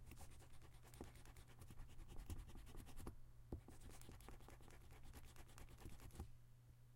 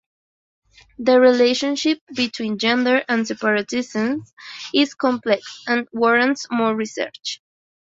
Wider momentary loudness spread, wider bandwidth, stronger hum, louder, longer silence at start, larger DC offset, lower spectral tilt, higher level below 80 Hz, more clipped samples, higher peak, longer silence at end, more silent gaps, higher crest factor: second, 7 LU vs 12 LU; first, 16 kHz vs 7.8 kHz; neither; second, -62 LUFS vs -20 LUFS; second, 0 s vs 1 s; neither; first, -5 dB/octave vs -3.5 dB/octave; about the same, -62 dBFS vs -64 dBFS; neither; second, -36 dBFS vs -4 dBFS; second, 0 s vs 0.55 s; second, none vs 2.01-2.07 s, 4.33-4.37 s; about the same, 22 dB vs 18 dB